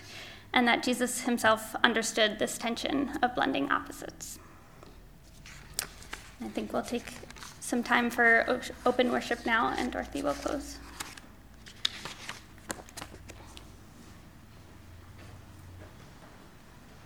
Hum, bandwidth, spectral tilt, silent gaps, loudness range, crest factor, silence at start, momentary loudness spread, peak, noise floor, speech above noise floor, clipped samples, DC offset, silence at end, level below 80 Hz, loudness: none; over 20 kHz; -3 dB/octave; none; 19 LU; 30 dB; 0 s; 24 LU; -4 dBFS; -52 dBFS; 23 dB; under 0.1%; under 0.1%; 0 s; -56 dBFS; -29 LUFS